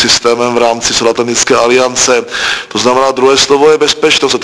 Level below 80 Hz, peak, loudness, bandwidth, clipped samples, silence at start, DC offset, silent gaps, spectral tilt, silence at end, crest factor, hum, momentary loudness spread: -42 dBFS; 0 dBFS; -9 LUFS; 11 kHz; 0.8%; 0 s; under 0.1%; none; -2 dB/octave; 0 s; 10 dB; none; 4 LU